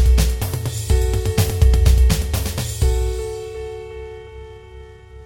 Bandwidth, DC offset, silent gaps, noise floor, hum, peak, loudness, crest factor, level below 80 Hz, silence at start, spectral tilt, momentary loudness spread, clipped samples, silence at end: 18 kHz; under 0.1%; none; -39 dBFS; none; -2 dBFS; -19 LUFS; 16 dB; -20 dBFS; 0 s; -5.5 dB/octave; 21 LU; under 0.1%; 0 s